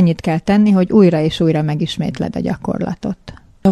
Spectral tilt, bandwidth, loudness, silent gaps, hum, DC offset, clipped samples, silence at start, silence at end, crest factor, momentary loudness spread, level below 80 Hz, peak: -8 dB/octave; 11 kHz; -16 LUFS; none; none; under 0.1%; under 0.1%; 0 s; 0 s; 14 dB; 11 LU; -42 dBFS; 0 dBFS